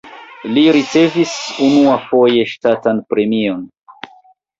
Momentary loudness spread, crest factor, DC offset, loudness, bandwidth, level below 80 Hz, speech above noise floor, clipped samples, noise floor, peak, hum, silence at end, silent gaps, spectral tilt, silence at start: 8 LU; 14 dB; under 0.1%; -14 LUFS; 7.8 kHz; -56 dBFS; 35 dB; under 0.1%; -48 dBFS; -2 dBFS; none; 0.55 s; none; -5 dB/octave; 0.05 s